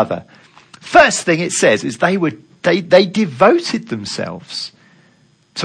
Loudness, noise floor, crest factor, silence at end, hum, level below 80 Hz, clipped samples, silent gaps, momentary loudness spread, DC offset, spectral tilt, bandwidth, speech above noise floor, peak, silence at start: -15 LUFS; -54 dBFS; 16 dB; 0 s; none; -52 dBFS; 0.1%; none; 15 LU; under 0.1%; -4 dB/octave; 10.5 kHz; 39 dB; 0 dBFS; 0 s